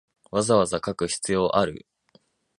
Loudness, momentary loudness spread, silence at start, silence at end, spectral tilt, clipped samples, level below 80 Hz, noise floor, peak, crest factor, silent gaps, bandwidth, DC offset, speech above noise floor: -24 LUFS; 8 LU; 0.35 s; 0.8 s; -4.5 dB/octave; under 0.1%; -54 dBFS; -62 dBFS; -6 dBFS; 20 dB; none; 11.5 kHz; under 0.1%; 39 dB